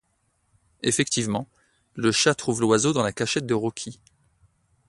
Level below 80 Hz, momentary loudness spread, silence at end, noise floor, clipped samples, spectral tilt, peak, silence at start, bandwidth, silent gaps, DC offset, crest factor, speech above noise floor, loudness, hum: -60 dBFS; 15 LU; 0.95 s; -70 dBFS; under 0.1%; -3.5 dB/octave; -6 dBFS; 0.85 s; 11.5 kHz; none; under 0.1%; 20 dB; 47 dB; -23 LUFS; none